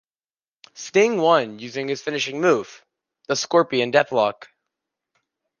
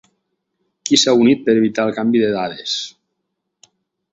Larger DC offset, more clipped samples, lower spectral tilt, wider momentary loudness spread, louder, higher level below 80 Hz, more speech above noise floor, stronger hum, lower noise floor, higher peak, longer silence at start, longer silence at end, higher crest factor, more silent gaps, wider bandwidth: neither; neither; about the same, -4 dB/octave vs -3.5 dB/octave; about the same, 10 LU vs 11 LU; second, -21 LUFS vs -16 LUFS; second, -72 dBFS vs -60 dBFS; first, over 70 dB vs 60 dB; neither; first, under -90 dBFS vs -75 dBFS; about the same, -2 dBFS vs 0 dBFS; about the same, 0.75 s vs 0.85 s; about the same, 1.15 s vs 1.25 s; about the same, 20 dB vs 18 dB; neither; first, 10 kHz vs 8 kHz